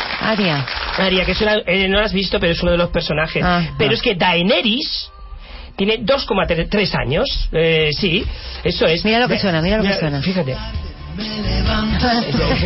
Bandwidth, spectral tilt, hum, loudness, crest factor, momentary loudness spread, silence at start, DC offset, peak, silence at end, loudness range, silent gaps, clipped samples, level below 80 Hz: 6 kHz; -8.5 dB/octave; none; -17 LUFS; 12 dB; 9 LU; 0 s; under 0.1%; -4 dBFS; 0 s; 2 LU; none; under 0.1%; -28 dBFS